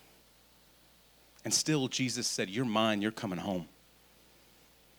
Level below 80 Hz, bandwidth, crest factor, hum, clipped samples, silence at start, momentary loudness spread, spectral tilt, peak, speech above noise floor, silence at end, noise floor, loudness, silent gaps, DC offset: -72 dBFS; over 20 kHz; 20 dB; none; under 0.1%; 1.45 s; 10 LU; -3.5 dB/octave; -14 dBFS; 30 dB; 1.3 s; -63 dBFS; -32 LUFS; none; under 0.1%